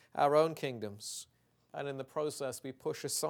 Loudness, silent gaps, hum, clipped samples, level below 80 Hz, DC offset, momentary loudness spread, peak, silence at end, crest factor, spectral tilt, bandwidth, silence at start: -36 LUFS; none; none; under 0.1%; -82 dBFS; under 0.1%; 15 LU; -14 dBFS; 0 s; 20 dB; -4 dB/octave; 18.5 kHz; 0.15 s